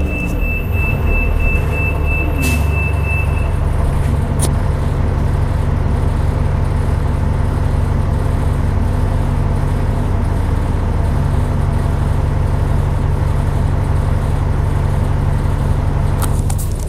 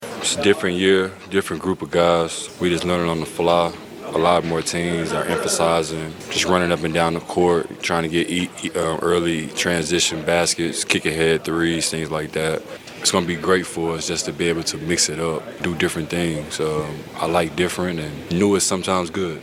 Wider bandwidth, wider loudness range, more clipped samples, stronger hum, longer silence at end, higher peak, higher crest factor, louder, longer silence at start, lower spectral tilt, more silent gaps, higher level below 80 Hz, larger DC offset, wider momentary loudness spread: about the same, 15.5 kHz vs 16.5 kHz; about the same, 1 LU vs 2 LU; neither; neither; about the same, 0 s vs 0 s; about the same, -2 dBFS vs 0 dBFS; second, 12 dB vs 20 dB; first, -17 LUFS vs -20 LUFS; about the same, 0 s vs 0 s; first, -7 dB/octave vs -3.5 dB/octave; neither; first, -18 dBFS vs -48 dBFS; neither; second, 1 LU vs 7 LU